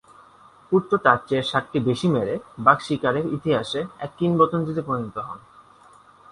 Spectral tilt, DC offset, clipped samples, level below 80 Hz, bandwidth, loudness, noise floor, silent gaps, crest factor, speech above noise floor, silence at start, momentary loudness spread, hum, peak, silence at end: -6.5 dB/octave; under 0.1%; under 0.1%; -58 dBFS; 11.5 kHz; -22 LUFS; -51 dBFS; none; 22 dB; 29 dB; 0.7 s; 10 LU; none; 0 dBFS; 0.95 s